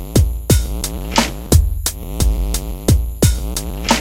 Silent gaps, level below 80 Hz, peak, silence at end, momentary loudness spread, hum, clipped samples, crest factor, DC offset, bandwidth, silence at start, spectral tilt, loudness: none; -20 dBFS; 0 dBFS; 0 s; 7 LU; none; under 0.1%; 16 dB; under 0.1%; 17 kHz; 0 s; -4.5 dB/octave; -18 LUFS